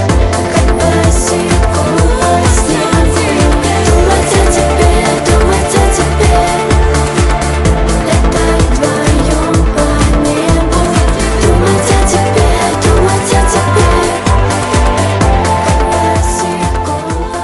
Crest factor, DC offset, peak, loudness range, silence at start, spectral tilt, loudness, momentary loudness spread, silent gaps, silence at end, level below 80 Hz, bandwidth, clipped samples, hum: 10 dB; under 0.1%; 0 dBFS; 1 LU; 0 s; -5 dB/octave; -10 LUFS; 2 LU; none; 0 s; -14 dBFS; 13.5 kHz; under 0.1%; none